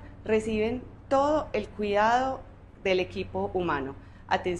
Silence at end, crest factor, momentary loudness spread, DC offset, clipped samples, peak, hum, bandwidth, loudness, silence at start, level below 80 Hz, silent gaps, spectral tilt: 0 s; 18 dB; 9 LU; under 0.1%; under 0.1%; -10 dBFS; none; 11 kHz; -28 LUFS; 0 s; -48 dBFS; none; -5.5 dB/octave